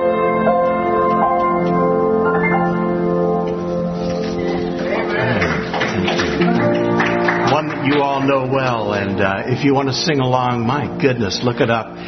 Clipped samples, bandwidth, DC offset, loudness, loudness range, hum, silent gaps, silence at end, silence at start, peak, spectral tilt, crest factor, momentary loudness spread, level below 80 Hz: under 0.1%; 6.4 kHz; under 0.1%; -17 LUFS; 2 LU; none; none; 0 s; 0 s; 0 dBFS; -6 dB/octave; 16 dB; 5 LU; -44 dBFS